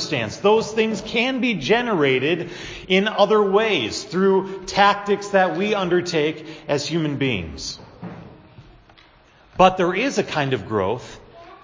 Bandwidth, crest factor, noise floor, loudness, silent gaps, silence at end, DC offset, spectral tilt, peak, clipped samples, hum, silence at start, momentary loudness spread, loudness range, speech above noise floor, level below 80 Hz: 7.6 kHz; 20 dB; -52 dBFS; -20 LUFS; none; 0.1 s; under 0.1%; -5 dB/octave; 0 dBFS; under 0.1%; none; 0 s; 14 LU; 6 LU; 32 dB; -50 dBFS